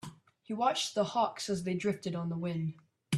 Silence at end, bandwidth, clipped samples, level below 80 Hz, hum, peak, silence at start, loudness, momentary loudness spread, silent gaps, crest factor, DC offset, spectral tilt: 0 s; 13.5 kHz; under 0.1%; -72 dBFS; none; -16 dBFS; 0.05 s; -33 LUFS; 8 LU; none; 18 dB; under 0.1%; -5 dB/octave